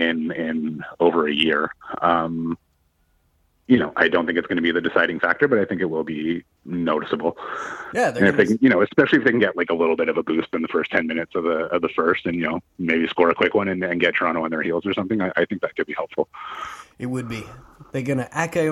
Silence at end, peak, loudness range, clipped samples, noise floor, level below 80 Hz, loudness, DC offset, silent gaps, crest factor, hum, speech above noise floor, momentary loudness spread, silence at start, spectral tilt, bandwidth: 0 s; -2 dBFS; 5 LU; under 0.1%; -65 dBFS; -58 dBFS; -21 LUFS; under 0.1%; none; 20 dB; none; 43 dB; 12 LU; 0 s; -6 dB/octave; 12 kHz